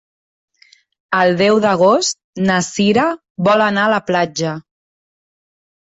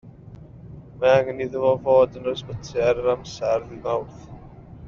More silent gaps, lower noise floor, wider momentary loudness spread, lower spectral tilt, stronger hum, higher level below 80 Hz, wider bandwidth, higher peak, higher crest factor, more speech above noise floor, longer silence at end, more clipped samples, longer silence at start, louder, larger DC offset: first, 2.24-2.33 s, 3.30-3.35 s vs none; first, -52 dBFS vs -43 dBFS; second, 8 LU vs 24 LU; about the same, -4.5 dB/octave vs -4.5 dB/octave; neither; second, -56 dBFS vs -50 dBFS; first, 8.2 kHz vs 7.2 kHz; first, -2 dBFS vs -6 dBFS; about the same, 14 dB vs 18 dB; first, 38 dB vs 21 dB; first, 1.25 s vs 0 s; neither; first, 1.1 s vs 0.05 s; first, -15 LUFS vs -22 LUFS; neither